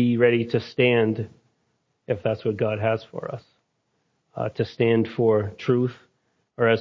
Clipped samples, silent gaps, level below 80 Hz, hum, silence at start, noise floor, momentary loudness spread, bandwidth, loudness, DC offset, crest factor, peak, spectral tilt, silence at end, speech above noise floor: under 0.1%; none; -58 dBFS; none; 0 s; -72 dBFS; 14 LU; 6.4 kHz; -23 LUFS; under 0.1%; 18 dB; -6 dBFS; -8.5 dB/octave; 0 s; 50 dB